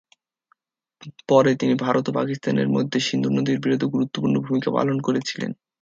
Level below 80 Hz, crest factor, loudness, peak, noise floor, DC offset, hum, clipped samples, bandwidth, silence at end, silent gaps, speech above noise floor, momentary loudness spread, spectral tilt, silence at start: -64 dBFS; 18 dB; -22 LUFS; -4 dBFS; -67 dBFS; under 0.1%; none; under 0.1%; 7.6 kHz; 0.3 s; none; 45 dB; 6 LU; -6 dB/octave; 1.05 s